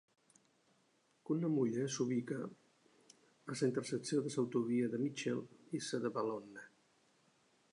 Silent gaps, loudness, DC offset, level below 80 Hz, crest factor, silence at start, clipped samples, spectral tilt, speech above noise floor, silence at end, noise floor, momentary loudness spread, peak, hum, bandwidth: none; -39 LUFS; under 0.1%; -88 dBFS; 18 dB; 1.3 s; under 0.1%; -5.5 dB/octave; 37 dB; 1.05 s; -75 dBFS; 12 LU; -22 dBFS; none; 11 kHz